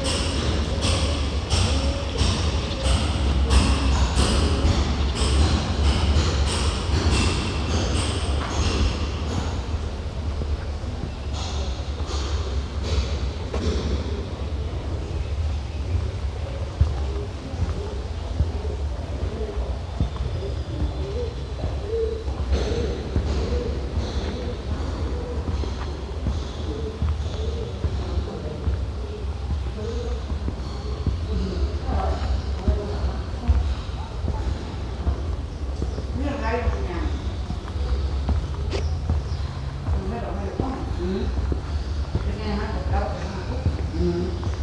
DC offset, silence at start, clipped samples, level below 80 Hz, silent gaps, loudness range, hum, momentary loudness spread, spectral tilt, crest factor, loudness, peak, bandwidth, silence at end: under 0.1%; 0 s; under 0.1%; -26 dBFS; none; 7 LU; none; 8 LU; -5.5 dB/octave; 18 dB; -26 LUFS; -6 dBFS; 10.5 kHz; 0 s